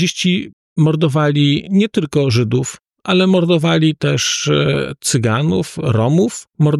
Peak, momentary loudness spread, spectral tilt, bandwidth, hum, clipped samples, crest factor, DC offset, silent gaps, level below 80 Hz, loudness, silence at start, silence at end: -4 dBFS; 5 LU; -5.5 dB/octave; 13 kHz; none; under 0.1%; 12 dB; under 0.1%; 0.53-0.76 s; -50 dBFS; -15 LUFS; 0 s; 0 s